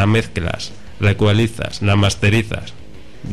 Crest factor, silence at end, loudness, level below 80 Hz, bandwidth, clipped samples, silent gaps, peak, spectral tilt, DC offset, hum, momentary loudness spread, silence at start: 14 dB; 0 s; -18 LUFS; -36 dBFS; 12.5 kHz; under 0.1%; none; -4 dBFS; -6 dB/octave; 3%; none; 14 LU; 0 s